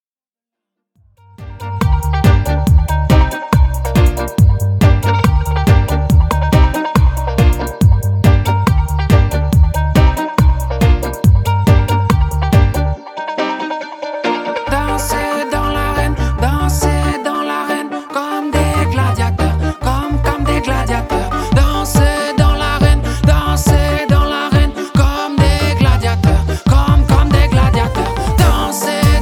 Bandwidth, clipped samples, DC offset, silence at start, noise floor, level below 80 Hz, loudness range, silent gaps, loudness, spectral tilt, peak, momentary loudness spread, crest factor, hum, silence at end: 18 kHz; under 0.1%; under 0.1%; 1.4 s; under -90 dBFS; -16 dBFS; 4 LU; none; -14 LUFS; -6 dB/octave; 0 dBFS; 6 LU; 12 dB; none; 0 s